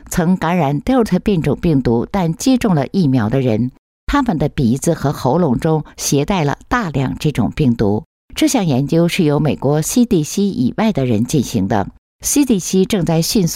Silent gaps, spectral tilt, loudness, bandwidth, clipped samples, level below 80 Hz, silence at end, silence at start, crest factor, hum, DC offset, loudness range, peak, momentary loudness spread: 3.79-4.07 s, 8.06-8.28 s, 11.98-12.19 s; -5.5 dB/octave; -16 LUFS; 16 kHz; under 0.1%; -36 dBFS; 0 s; 0.05 s; 12 dB; none; under 0.1%; 1 LU; -4 dBFS; 4 LU